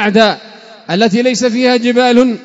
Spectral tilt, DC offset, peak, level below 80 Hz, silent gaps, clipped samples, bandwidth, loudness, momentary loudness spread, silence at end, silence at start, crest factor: -4.5 dB/octave; under 0.1%; 0 dBFS; -54 dBFS; none; 0.4%; 8 kHz; -11 LUFS; 5 LU; 0 s; 0 s; 12 dB